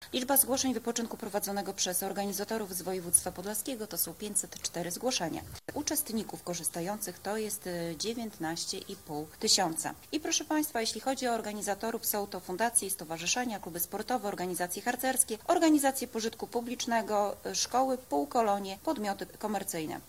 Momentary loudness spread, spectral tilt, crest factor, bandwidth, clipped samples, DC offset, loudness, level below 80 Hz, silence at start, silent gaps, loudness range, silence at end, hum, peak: 10 LU; -2.5 dB/octave; 24 dB; 16 kHz; under 0.1%; under 0.1%; -32 LUFS; -64 dBFS; 0 s; none; 4 LU; 0 s; none; -10 dBFS